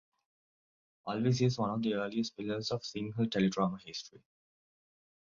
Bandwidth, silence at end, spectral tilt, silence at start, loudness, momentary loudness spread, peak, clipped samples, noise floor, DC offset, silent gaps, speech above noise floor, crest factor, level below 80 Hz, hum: 7.4 kHz; 1.15 s; -6 dB/octave; 1.05 s; -34 LUFS; 13 LU; -18 dBFS; under 0.1%; under -90 dBFS; under 0.1%; none; over 57 dB; 18 dB; -70 dBFS; none